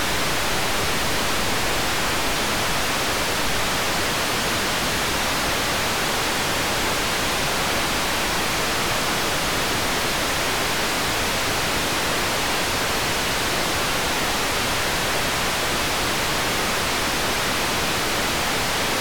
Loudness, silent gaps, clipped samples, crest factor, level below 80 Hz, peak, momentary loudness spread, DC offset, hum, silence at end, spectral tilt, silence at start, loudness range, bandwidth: -21 LUFS; none; under 0.1%; 12 dB; -38 dBFS; -12 dBFS; 0 LU; 2%; none; 0 s; -2 dB/octave; 0 s; 0 LU; over 20 kHz